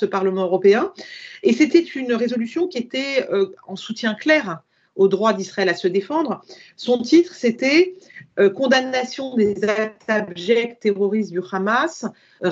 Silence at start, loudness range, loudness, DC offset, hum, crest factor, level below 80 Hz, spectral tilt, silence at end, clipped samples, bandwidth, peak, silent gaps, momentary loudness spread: 0 s; 2 LU; -20 LUFS; under 0.1%; none; 18 dB; -68 dBFS; -5 dB/octave; 0 s; under 0.1%; 7.8 kHz; -2 dBFS; none; 12 LU